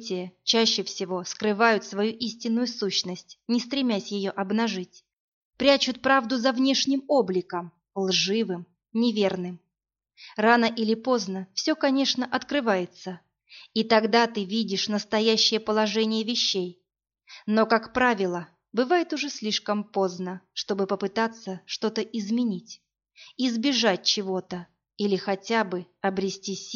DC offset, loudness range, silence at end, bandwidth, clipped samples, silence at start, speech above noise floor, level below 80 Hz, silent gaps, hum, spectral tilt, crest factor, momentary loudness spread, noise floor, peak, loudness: under 0.1%; 4 LU; 0 s; 7.4 kHz; under 0.1%; 0 s; 60 dB; -68 dBFS; 5.13-5.51 s; none; -2.5 dB/octave; 20 dB; 12 LU; -86 dBFS; -6 dBFS; -25 LUFS